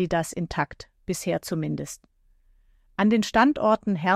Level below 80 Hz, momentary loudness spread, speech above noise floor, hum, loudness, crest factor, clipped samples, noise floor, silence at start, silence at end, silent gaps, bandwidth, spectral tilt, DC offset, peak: -52 dBFS; 17 LU; 37 dB; none; -25 LUFS; 18 dB; under 0.1%; -60 dBFS; 0 s; 0 s; none; 15 kHz; -5.5 dB/octave; under 0.1%; -8 dBFS